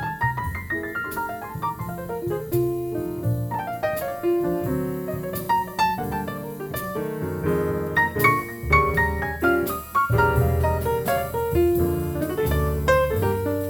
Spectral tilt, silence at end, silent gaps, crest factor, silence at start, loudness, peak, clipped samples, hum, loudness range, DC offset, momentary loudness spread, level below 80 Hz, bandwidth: -6.5 dB/octave; 0 s; none; 18 dB; 0 s; -24 LUFS; -6 dBFS; under 0.1%; none; 6 LU; under 0.1%; 9 LU; -36 dBFS; over 20 kHz